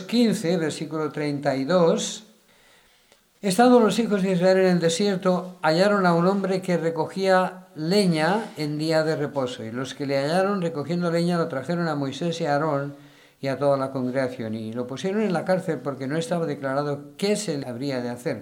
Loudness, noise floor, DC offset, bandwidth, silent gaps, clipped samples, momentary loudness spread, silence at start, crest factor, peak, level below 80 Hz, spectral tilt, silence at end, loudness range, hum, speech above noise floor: -24 LUFS; -59 dBFS; under 0.1%; 17.5 kHz; none; under 0.1%; 10 LU; 0 s; 18 dB; -6 dBFS; -70 dBFS; -5.5 dB/octave; 0 s; 6 LU; none; 36 dB